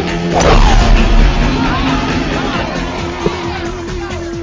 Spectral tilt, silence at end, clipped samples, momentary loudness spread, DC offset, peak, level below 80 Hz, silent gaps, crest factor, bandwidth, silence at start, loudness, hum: -5.5 dB/octave; 0 s; under 0.1%; 11 LU; under 0.1%; 0 dBFS; -14 dBFS; none; 12 dB; 7.6 kHz; 0 s; -14 LUFS; none